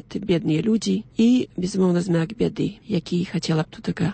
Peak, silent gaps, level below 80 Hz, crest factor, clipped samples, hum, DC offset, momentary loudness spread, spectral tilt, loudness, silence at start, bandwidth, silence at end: -8 dBFS; none; -52 dBFS; 14 dB; under 0.1%; none; under 0.1%; 7 LU; -6.5 dB/octave; -23 LUFS; 0.1 s; 8.8 kHz; 0 s